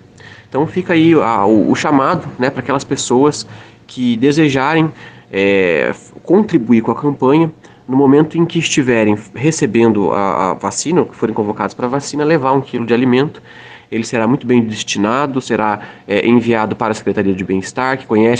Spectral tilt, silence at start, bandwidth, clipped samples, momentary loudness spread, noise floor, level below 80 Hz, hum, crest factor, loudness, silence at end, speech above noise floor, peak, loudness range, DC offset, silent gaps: -5.5 dB/octave; 0.25 s; 9.8 kHz; under 0.1%; 7 LU; -39 dBFS; -52 dBFS; none; 14 dB; -14 LUFS; 0 s; 25 dB; 0 dBFS; 2 LU; under 0.1%; none